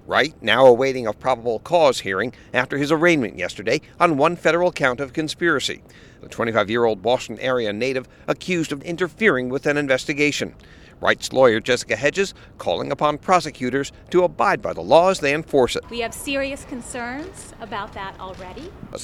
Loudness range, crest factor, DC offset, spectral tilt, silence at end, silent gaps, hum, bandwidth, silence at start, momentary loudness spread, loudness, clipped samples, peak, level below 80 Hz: 3 LU; 20 dB; under 0.1%; -4.5 dB/octave; 0 s; none; none; 15 kHz; 0.1 s; 14 LU; -20 LUFS; under 0.1%; 0 dBFS; -50 dBFS